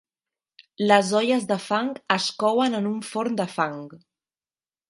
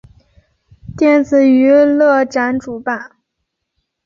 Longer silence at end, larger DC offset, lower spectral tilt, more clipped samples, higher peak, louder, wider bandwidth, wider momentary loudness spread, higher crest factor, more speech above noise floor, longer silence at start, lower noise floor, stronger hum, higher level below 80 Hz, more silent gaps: about the same, 0.9 s vs 1 s; neither; second, -4.5 dB/octave vs -6.5 dB/octave; neither; about the same, -2 dBFS vs -2 dBFS; second, -23 LUFS vs -12 LUFS; first, 11.5 kHz vs 7.4 kHz; second, 9 LU vs 12 LU; first, 24 dB vs 12 dB; first, over 67 dB vs 62 dB; about the same, 0.8 s vs 0.9 s; first, under -90 dBFS vs -74 dBFS; neither; second, -74 dBFS vs -50 dBFS; neither